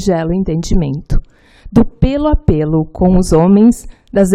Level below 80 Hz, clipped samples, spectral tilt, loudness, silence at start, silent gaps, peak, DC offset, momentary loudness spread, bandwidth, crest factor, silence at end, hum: -20 dBFS; under 0.1%; -7.5 dB/octave; -13 LUFS; 0 s; none; 0 dBFS; under 0.1%; 10 LU; 13.5 kHz; 12 dB; 0 s; none